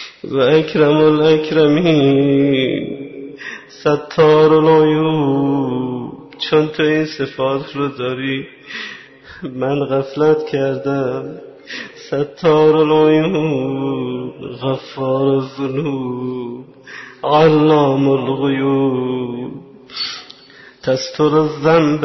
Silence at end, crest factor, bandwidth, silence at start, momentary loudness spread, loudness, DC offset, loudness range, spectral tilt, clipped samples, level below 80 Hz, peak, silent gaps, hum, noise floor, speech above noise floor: 0 s; 14 dB; 6.2 kHz; 0 s; 18 LU; -15 LUFS; under 0.1%; 6 LU; -7 dB/octave; under 0.1%; -54 dBFS; -2 dBFS; none; none; -43 dBFS; 28 dB